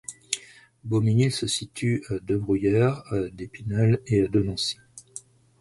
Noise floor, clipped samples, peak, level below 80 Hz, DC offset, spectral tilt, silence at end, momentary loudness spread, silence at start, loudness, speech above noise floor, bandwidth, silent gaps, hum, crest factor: -46 dBFS; under 0.1%; -2 dBFS; -50 dBFS; under 0.1%; -5.5 dB/octave; 0.4 s; 17 LU; 0.1 s; -25 LUFS; 23 dB; 11.5 kHz; none; none; 22 dB